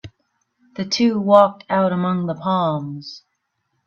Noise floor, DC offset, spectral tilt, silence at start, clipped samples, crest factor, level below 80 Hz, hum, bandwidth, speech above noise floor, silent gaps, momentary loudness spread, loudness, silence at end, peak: -72 dBFS; under 0.1%; -6 dB/octave; 0.05 s; under 0.1%; 20 dB; -62 dBFS; none; 7.2 kHz; 54 dB; none; 18 LU; -18 LUFS; 0.7 s; 0 dBFS